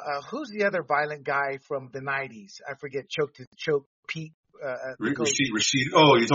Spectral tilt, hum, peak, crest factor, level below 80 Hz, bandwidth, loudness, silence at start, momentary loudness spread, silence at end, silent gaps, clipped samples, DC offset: -2.5 dB/octave; none; -6 dBFS; 22 dB; -66 dBFS; 7.6 kHz; -26 LUFS; 0 s; 16 LU; 0 s; 3.47-3.52 s, 3.86-4.03 s, 4.34-4.43 s; under 0.1%; under 0.1%